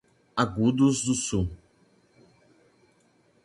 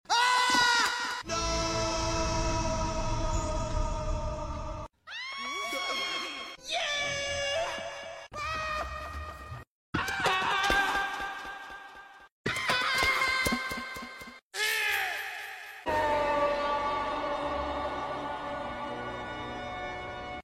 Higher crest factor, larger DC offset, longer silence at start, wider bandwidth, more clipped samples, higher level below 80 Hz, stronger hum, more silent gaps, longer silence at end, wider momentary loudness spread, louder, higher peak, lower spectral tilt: about the same, 22 dB vs 20 dB; neither; first, 0.35 s vs 0.1 s; second, 11.5 kHz vs 16 kHz; neither; second, -48 dBFS vs -42 dBFS; neither; second, none vs 9.67-9.93 s, 12.32-12.44 s, 14.42-14.51 s; first, 1.9 s vs 0 s; second, 10 LU vs 15 LU; first, -26 LUFS vs -30 LUFS; first, -8 dBFS vs -12 dBFS; first, -5 dB/octave vs -3 dB/octave